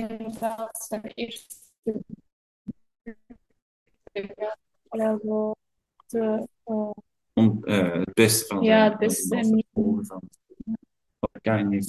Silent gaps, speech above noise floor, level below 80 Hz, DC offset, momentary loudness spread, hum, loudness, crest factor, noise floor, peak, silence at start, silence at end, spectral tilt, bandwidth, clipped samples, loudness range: 1.78-1.82 s, 2.32-2.65 s, 3.62-3.86 s; 41 dB; -60 dBFS; under 0.1%; 22 LU; none; -25 LUFS; 22 dB; -66 dBFS; -4 dBFS; 0 s; 0 s; -5 dB/octave; 12.5 kHz; under 0.1%; 16 LU